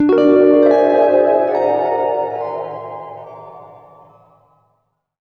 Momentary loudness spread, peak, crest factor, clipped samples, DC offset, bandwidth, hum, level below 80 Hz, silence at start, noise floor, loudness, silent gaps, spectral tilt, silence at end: 22 LU; 0 dBFS; 16 dB; under 0.1%; under 0.1%; 6.2 kHz; none; -60 dBFS; 0 s; -66 dBFS; -14 LUFS; none; -8 dB/octave; 1.55 s